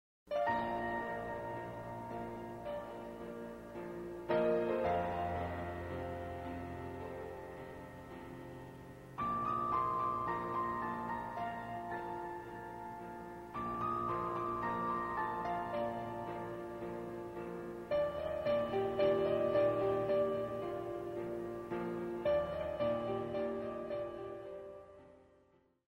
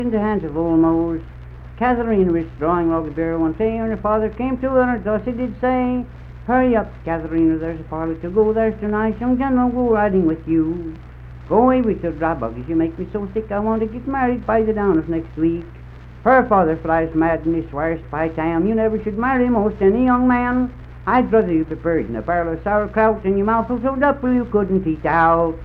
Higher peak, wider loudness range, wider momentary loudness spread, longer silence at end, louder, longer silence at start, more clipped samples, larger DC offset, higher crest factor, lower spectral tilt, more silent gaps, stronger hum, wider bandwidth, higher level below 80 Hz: second, -20 dBFS vs -2 dBFS; first, 8 LU vs 3 LU; first, 14 LU vs 9 LU; first, 0.65 s vs 0 s; second, -39 LUFS vs -19 LUFS; first, 0.25 s vs 0 s; neither; neither; about the same, 18 dB vs 16 dB; second, -7.5 dB/octave vs -10.5 dB/octave; neither; neither; first, 16 kHz vs 4.6 kHz; second, -62 dBFS vs -36 dBFS